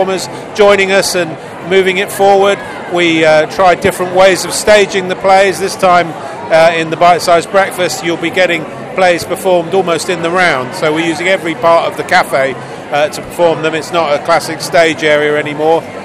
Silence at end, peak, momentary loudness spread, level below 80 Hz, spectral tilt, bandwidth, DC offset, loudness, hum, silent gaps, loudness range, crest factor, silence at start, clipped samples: 0 s; 0 dBFS; 7 LU; -46 dBFS; -3.5 dB/octave; 15.5 kHz; under 0.1%; -11 LUFS; none; none; 3 LU; 10 dB; 0 s; 0.7%